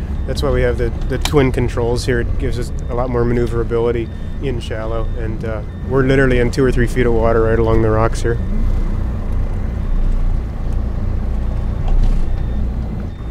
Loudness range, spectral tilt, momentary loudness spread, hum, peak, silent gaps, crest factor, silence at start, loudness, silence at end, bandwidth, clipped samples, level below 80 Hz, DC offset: 6 LU; -7 dB/octave; 9 LU; none; 0 dBFS; none; 16 dB; 0 s; -19 LUFS; 0 s; 12.5 kHz; under 0.1%; -18 dBFS; under 0.1%